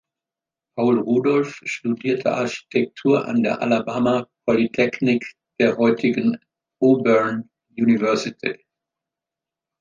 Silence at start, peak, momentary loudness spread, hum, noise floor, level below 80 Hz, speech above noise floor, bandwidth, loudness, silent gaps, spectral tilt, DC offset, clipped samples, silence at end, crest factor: 0.75 s; -4 dBFS; 9 LU; none; -88 dBFS; -64 dBFS; 69 dB; 7.4 kHz; -20 LUFS; none; -6.5 dB/octave; under 0.1%; under 0.1%; 1.25 s; 18 dB